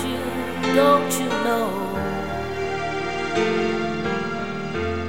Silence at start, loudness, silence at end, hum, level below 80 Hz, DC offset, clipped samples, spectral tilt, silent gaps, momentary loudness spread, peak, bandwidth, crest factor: 0 s; -23 LUFS; 0 s; none; -46 dBFS; 1%; under 0.1%; -4.5 dB/octave; none; 9 LU; -4 dBFS; 16.5 kHz; 20 dB